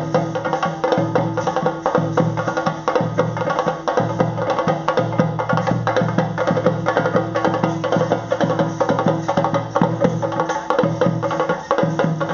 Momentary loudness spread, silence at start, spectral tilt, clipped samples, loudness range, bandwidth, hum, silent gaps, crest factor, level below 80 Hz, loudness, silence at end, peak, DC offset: 3 LU; 0 s; -6 dB/octave; under 0.1%; 1 LU; 7.2 kHz; none; none; 18 dB; -52 dBFS; -19 LUFS; 0 s; 0 dBFS; under 0.1%